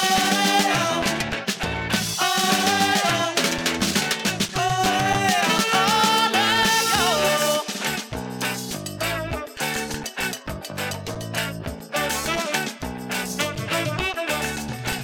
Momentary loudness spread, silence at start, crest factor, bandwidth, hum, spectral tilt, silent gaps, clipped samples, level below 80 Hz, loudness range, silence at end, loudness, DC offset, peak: 11 LU; 0 s; 18 dB; over 20 kHz; none; -2.5 dB/octave; none; under 0.1%; -46 dBFS; 8 LU; 0 s; -22 LUFS; under 0.1%; -6 dBFS